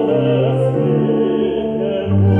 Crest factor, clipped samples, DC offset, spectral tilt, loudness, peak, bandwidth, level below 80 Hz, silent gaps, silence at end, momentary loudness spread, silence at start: 12 dB; under 0.1%; under 0.1%; -10 dB/octave; -16 LUFS; -4 dBFS; 3.6 kHz; -48 dBFS; none; 0 s; 4 LU; 0 s